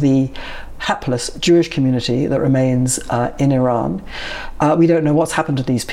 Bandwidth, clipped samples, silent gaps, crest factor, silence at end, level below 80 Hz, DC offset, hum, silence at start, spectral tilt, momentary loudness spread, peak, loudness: 15 kHz; under 0.1%; none; 12 dB; 0 s; -36 dBFS; under 0.1%; none; 0 s; -5.5 dB/octave; 11 LU; -4 dBFS; -17 LUFS